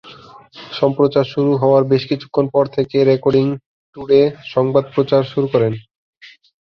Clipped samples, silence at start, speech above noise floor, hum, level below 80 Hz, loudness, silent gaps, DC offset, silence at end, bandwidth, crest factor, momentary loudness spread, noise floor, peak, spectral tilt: under 0.1%; 0.05 s; 26 dB; none; -54 dBFS; -16 LUFS; 3.66-3.93 s, 5.95-6.21 s; under 0.1%; 0.4 s; 6.2 kHz; 14 dB; 7 LU; -41 dBFS; -2 dBFS; -9 dB/octave